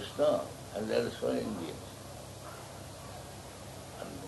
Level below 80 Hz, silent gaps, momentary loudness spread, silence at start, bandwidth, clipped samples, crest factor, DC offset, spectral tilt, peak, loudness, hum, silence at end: -60 dBFS; none; 16 LU; 0 s; 12 kHz; under 0.1%; 18 dB; under 0.1%; -5 dB/octave; -18 dBFS; -37 LUFS; none; 0 s